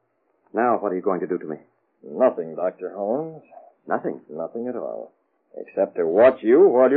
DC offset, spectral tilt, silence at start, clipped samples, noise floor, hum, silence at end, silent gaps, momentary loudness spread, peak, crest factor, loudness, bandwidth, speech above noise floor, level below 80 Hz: under 0.1%; -6.5 dB/octave; 0.55 s; under 0.1%; -66 dBFS; none; 0 s; none; 20 LU; -4 dBFS; 18 dB; -22 LUFS; 4.1 kHz; 45 dB; -72 dBFS